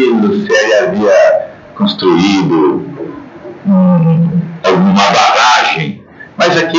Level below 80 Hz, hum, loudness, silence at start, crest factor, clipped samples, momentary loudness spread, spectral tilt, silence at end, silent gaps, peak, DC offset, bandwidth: -52 dBFS; none; -10 LUFS; 0 s; 10 dB; under 0.1%; 17 LU; -5.5 dB/octave; 0 s; none; 0 dBFS; under 0.1%; 7.8 kHz